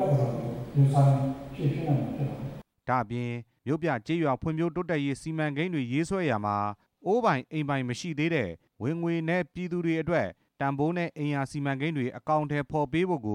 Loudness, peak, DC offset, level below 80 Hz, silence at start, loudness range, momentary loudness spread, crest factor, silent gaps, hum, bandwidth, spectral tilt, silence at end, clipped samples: -29 LUFS; -12 dBFS; under 0.1%; -58 dBFS; 0 s; 2 LU; 8 LU; 16 dB; none; none; 10.5 kHz; -7.5 dB/octave; 0 s; under 0.1%